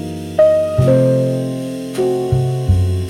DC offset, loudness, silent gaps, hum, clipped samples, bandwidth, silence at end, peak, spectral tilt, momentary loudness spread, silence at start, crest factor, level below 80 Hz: under 0.1%; -16 LUFS; none; none; under 0.1%; 13.5 kHz; 0 s; -2 dBFS; -8 dB/octave; 9 LU; 0 s; 12 dB; -34 dBFS